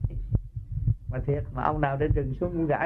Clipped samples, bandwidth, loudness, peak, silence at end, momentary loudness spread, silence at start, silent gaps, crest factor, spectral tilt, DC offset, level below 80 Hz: under 0.1%; 3.9 kHz; -29 LUFS; -8 dBFS; 0 s; 5 LU; 0 s; none; 18 dB; -11 dB/octave; under 0.1%; -34 dBFS